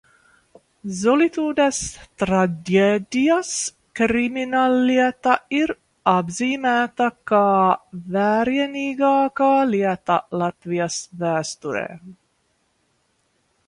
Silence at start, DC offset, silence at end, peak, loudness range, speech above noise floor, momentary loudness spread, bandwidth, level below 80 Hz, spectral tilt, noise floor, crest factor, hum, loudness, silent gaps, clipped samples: 0.85 s; under 0.1%; 1.55 s; -2 dBFS; 4 LU; 47 dB; 9 LU; 11.5 kHz; -56 dBFS; -4.5 dB/octave; -67 dBFS; 18 dB; none; -20 LUFS; none; under 0.1%